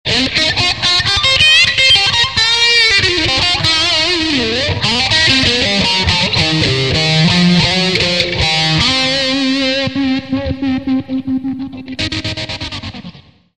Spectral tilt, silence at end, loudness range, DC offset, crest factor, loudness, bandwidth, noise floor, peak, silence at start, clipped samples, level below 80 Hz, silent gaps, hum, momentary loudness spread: -3.5 dB/octave; 0.4 s; 8 LU; 0.7%; 14 dB; -11 LUFS; 12 kHz; -36 dBFS; 0 dBFS; 0.05 s; under 0.1%; -34 dBFS; none; none; 12 LU